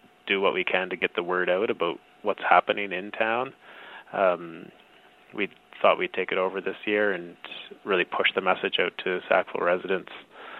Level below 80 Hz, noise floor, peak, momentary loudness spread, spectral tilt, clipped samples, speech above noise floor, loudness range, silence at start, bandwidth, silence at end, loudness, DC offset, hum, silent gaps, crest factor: -74 dBFS; -55 dBFS; -2 dBFS; 16 LU; -6.5 dB/octave; under 0.1%; 29 dB; 3 LU; 0.25 s; 4.6 kHz; 0 s; -26 LUFS; under 0.1%; none; none; 24 dB